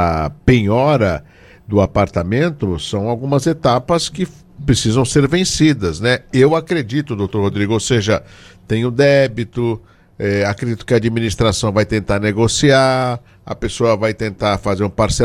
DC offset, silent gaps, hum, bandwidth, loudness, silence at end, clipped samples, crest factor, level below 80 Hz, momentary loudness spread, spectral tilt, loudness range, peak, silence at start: under 0.1%; none; none; 13.5 kHz; -16 LUFS; 0 s; under 0.1%; 16 dB; -36 dBFS; 8 LU; -5.5 dB/octave; 2 LU; 0 dBFS; 0 s